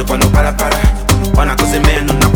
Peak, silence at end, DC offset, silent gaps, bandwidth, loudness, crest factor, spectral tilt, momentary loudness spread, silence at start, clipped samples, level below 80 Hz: 0 dBFS; 0 s; under 0.1%; none; over 20 kHz; -12 LUFS; 10 dB; -5 dB/octave; 2 LU; 0 s; under 0.1%; -14 dBFS